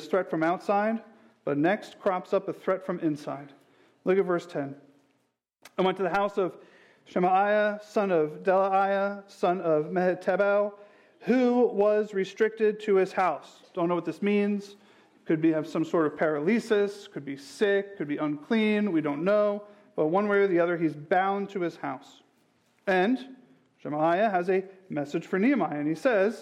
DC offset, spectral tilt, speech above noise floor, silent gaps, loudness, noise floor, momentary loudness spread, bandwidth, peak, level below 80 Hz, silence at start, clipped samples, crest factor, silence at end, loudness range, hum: under 0.1%; -7 dB/octave; 48 dB; none; -27 LUFS; -74 dBFS; 12 LU; 12 kHz; -14 dBFS; -76 dBFS; 0 s; under 0.1%; 14 dB; 0 s; 4 LU; none